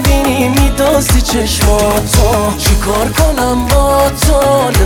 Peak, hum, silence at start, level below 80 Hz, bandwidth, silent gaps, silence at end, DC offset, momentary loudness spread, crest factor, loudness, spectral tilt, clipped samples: 0 dBFS; none; 0 s; -16 dBFS; 18 kHz; none; 0 s; under 0.1%; 2 LU; 10 dB; -11 LUFS; -4.5 dB/octave; under 0.1%